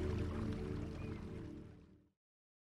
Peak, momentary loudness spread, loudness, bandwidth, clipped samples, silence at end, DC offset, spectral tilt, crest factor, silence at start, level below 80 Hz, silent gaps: -28 dBFS; 15 LU; -45 LUFS; 11 kHz; under 0.1%; 0.8 s; under 0.1%; -8 dB/octave; 16 dB; 0 s; -52 dBFS; none